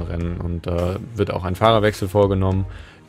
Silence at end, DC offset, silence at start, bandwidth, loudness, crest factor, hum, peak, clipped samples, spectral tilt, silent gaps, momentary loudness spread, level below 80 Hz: 0.2 s; under 0.1%; 0 s; 15 kHz; -20 LUFS; 20 dB; none; 0 dBFS; under 0.1%; -7 dB/octave; none; 10 LU; -36 dBFS